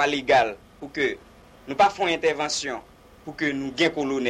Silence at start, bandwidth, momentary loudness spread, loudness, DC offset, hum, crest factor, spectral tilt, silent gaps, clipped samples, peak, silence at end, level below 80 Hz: 0 s; 13 kHz; 18 LU; -24 LUFS; under 0.1%; none; 16 dB; -3 dB/octave; none; under 0.1%; -8 dBFS; 0 s; -56 dBFS